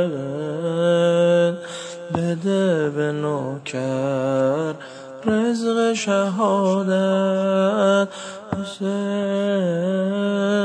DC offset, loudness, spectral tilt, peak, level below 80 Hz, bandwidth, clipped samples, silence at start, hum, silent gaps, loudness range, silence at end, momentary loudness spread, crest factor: under 0.1%; -21 LUFS; -6 dB/octave; -6 dBFS; -64 dBFS; 10 kHz; under 0.1%; 0 s; none; none; 3 LU; 0 s; 10 LU; 14 dB